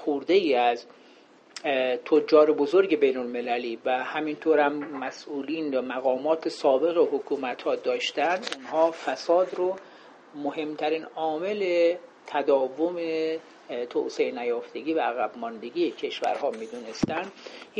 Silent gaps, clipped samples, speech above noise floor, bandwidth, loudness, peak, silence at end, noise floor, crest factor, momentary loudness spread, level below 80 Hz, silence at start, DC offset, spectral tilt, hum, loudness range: none; under 0.1%; 28 dB; 9 kHz; -26 LUFS; -6 dBFS; 0 s; -54 dBFS; 20 dB; 11 LU; -68 dBFS; 0 s; under 0.1%; -4.5 dB/octave; none; 5 LU